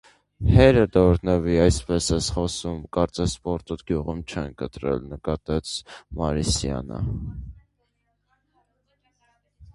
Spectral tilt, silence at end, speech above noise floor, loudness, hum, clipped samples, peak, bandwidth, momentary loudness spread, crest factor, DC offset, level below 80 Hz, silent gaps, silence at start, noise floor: -6 dB/octave; 0.05 s; 49 dB; -23 LUFS; 50 Hz at -55 dBFS; under 0.1%; 0 dBFS; 11.5 kHz; 15 LU; 22 dB; under 0.1%; -34 dBFS; none; 0.4 s; -72 dBFS